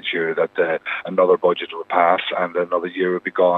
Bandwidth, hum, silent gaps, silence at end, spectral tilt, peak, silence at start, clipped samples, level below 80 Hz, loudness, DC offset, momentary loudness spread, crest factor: 4.2 kHz; none; none; 0 s; -7 dB/octave; 0 dBFS; 0.05 s; under 0.1%; -74 dBFS; -20 LUFS; under 0.1%; 6 LU; 18 dB